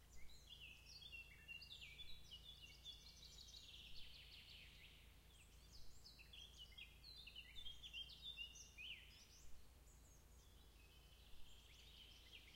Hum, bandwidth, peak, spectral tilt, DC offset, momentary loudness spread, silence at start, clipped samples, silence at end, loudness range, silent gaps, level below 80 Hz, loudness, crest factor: none; 16 kHz; -42 dBFS; -1.5 dB/octave; under 0.1%; 14 LU; 0 s; under 0.1%; 0 s; 6 LU; none; -68 dBFS; -59 LUFS; 18 dB